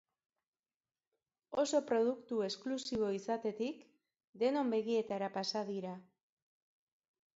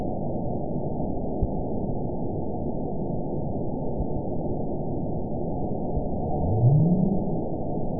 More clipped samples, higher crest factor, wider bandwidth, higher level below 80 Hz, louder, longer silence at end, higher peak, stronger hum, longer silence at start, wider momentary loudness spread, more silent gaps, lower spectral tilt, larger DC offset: neither; about the same, 18 dB vs 16 dB; first, 7.6 kHz vs 1 kHz; second, -78 dBFS vs -36 dBFS; second, -37 LUFS vs -28 LUFS; first, 1.35 s vs 0 s; second, -20 dBFS vs -10 dBFS; neither; first, 1.5 s vs 0 s; about the same, 9 LU vs 8 LU; first, 4.24-4.33 s vs none; second, -4 dB/octave vs -19 dB/octave; second, under 0.1% vs 3%